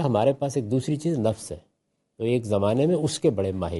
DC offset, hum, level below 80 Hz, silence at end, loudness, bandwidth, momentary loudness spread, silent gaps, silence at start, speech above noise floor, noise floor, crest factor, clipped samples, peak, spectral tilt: under 0.1%; none; -58 dBFS; 0 s; -25 LUFS; 11.5 kHz; 9 LU; none; 0 s; 51 dB; -75 dBFS; 16 dB; under 0.1%; -10 dBFS; -6.5 dB/octave